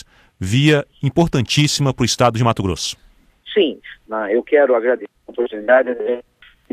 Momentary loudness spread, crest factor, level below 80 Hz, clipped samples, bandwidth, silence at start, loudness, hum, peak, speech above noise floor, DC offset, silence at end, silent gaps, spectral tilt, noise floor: 11 LU; 18 dB; -44 dBFS; under 0.1%; 15.5 kHz; 0.4 s; -17 LUFS; none; 0 dBFS; 21 dB; under 0.1%; 0.5 s; none; -5 dB/octave; -38 dBFS